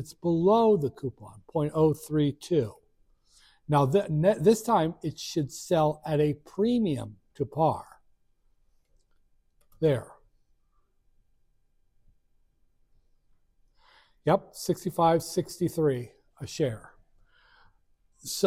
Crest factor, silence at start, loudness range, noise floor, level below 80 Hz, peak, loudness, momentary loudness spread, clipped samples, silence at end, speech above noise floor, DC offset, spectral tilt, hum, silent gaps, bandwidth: 20 dB; 0 s; 10 LU; -68 dBFS; -60 dBFS; -10 dBFS; -27 LUFS; 13 LU; under 0.1%; 0 s; 41 dB; under 0.1%; -6.5 dB/octave; none; none; 16 kHz